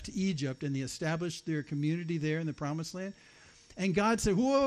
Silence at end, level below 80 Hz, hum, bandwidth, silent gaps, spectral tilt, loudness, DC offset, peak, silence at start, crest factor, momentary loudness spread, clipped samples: 0 s; -54 dBFS; none; 13 kHz; none; -5.5 dB/octave; -33 LUFS; under 0.1%; -16 dBFS; 0 s; 16 dB; 9 LU; under 0.1%